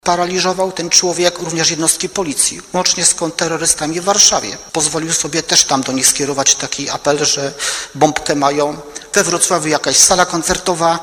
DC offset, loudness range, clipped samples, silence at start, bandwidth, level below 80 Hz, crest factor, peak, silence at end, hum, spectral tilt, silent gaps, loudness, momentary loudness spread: under 0.1%; 2 LU; under 0.1%; 0.05 s; over 20 kHz; -46 dBFS; 16 dB; 0 dBFS; 0 s; none; -1.5 dB/octave; none; -13 LUFS; 9 LU